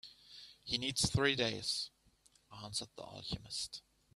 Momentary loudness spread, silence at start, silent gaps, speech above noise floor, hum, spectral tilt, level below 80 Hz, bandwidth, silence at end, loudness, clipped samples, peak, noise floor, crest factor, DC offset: 21 LU; 0.05 s; none; 32 dB; none; -3 dB/octave; -62 dBFS; 15 kHz; 0.35 s; -37 LUFS; under 0.1%; -16 dBFS; -70 dBFS; 24 dB; under 0.1%